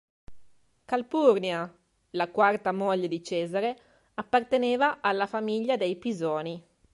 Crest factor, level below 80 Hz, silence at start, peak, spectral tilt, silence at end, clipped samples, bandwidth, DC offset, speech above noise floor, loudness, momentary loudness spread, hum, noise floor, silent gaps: 20 dB; -68 dBFS; 0.3 s; -8 dBFS; -5.5 dB/octave; 0.35 s; under 0.1%; 11.5 kHz; under 0.1%; 28 dB; -27 LUFS; 15 LU; none; -55 dBFS; none